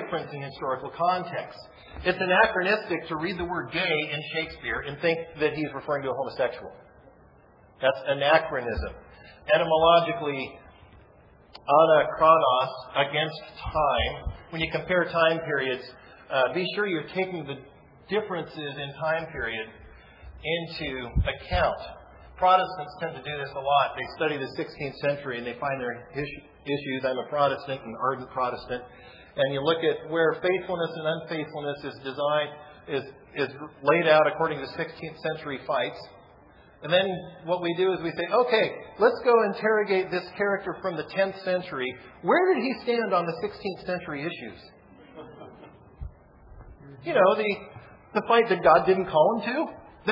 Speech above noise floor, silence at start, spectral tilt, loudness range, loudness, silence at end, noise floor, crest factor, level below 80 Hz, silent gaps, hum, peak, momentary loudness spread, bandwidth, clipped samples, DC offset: 30 dB; 0 s; -7.5 dB/octave; 7 LU; -26 LUFS; 0 s; -56 dBFS; 22 dB; -48 dBFS; none; none; -4 dBFS; 15 LU; 5.6 kHz; under 0.1%; under 0.1%